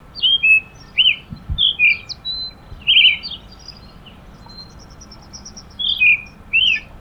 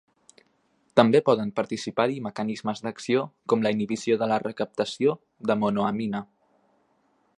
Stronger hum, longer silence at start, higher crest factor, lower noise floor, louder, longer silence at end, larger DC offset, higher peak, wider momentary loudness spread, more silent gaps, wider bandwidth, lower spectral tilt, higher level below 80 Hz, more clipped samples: neither; second, 0.15 s vs 0.95 s; second, 18 dB vs 26 dB; second, -40 dBFS vs -67 dBFS; first, -14 LUFS vs -26 LUFS; second, 0.05 s vs 1.15 s; neither; about the same, -2 dBFS vs -2 dBFS; first, 20 LU vs 10 LU; neither; first, 13 kHz vs 11 kHz; second, -1 dB/octave vs -6 dB/octave; first, -40 dBFS vs -68 dBFS; neither